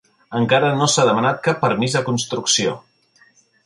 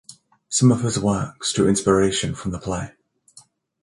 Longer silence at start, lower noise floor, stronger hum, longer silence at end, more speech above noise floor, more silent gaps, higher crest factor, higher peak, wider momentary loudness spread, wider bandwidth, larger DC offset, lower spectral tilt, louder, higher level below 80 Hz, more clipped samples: first, 0.3 s vs 0.1 s; first, -56 dBFS vs -52 dBFS; neither; about the same, 0.85 s vs 0.95 s; first, 38 dB vs 33 dB; neither; about the same, 16 dB vs 18 dB; about the same, -2 dBFS vs -4 dBFS; second, 8 LU vs 11 LU; about the same, 11.5 kHz vs 11.5 kHz; neither; second, -3.5 dB/octave vs -5 dB/octave; first, -18 LUFS vs -21 LUFS; second, -60 dBFS vs -46 dBFS; neither